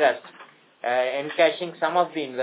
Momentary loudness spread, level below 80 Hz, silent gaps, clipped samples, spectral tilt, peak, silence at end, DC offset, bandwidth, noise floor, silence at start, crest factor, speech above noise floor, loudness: 7 LU; -90 dBFS; none; under 0.1%; -7.5 dB/octave; -6 dBFS; 0 s; under 0.1%; 4 kHz; -50 dBFS; 0 s; 18 dB; 26 dB; -24 LUFS